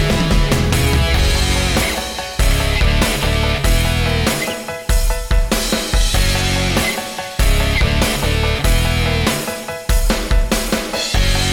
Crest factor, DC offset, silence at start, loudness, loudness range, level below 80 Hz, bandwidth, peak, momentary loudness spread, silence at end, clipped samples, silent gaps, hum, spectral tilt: 14 dB; under 0.1%; 0 s; -17 LUFS; 1 LU; -18 dBFS; 18 kHz; -2 dBFS; 5 LU; 0 s; under 0.1%; none; none; -4 dB/octave